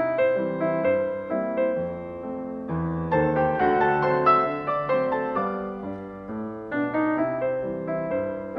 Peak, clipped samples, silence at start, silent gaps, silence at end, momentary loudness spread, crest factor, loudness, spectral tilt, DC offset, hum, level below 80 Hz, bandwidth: -8 dBFS; under 0.1%; 0 s; none; 0 s; 12 LU; 18 dB; -25 LUFS; -9.5 dB/octave; under 0.1%; none; -52 dBFS; 5.8 kHz